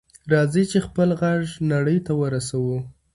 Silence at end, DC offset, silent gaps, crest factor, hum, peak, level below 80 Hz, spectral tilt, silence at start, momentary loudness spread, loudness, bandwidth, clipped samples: 0.25 s; under 0.1%; none; 18 dB; none; -4 dBFS; -52 dBFS; -6.5 dB/octave; 0.25 s; 5 LU; -22 LUFS; 11.5 kHz; under 0.1%